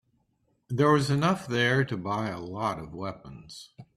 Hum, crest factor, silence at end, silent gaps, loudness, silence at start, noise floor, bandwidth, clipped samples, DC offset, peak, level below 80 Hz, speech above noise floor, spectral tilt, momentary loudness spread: none; 18 dB; 0.15 s; none; -27 LUFS; 0.7 s; -72 dBFS; 13 kHz; under 0.1%; under 0.1%; -10 dBFS; -60 dBFS; 45 dB; -6 dB/octave; 21 LU